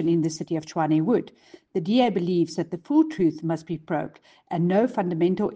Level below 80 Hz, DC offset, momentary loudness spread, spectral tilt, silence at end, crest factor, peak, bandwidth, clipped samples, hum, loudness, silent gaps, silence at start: -64 dBFS; under 0.1%; 9 LU; -7 dB/octave; 0 s; 16 dB; -8 dBFS; 8.8 kHz; under 0.1%; none; -24 LUFS; none; 0 s